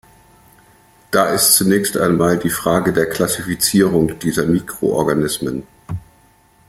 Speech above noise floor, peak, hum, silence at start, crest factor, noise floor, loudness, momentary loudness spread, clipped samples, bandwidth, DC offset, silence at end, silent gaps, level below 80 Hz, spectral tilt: 36 dB; 0 dBFS; none; 1.1 s; 18 dB; -52 dBFS; -16 LUFS; 13 LU; under 0.1%; 16.5 kHz; under 0.1%; 0.7 s; none; -46 dBFS; -4 dB/octave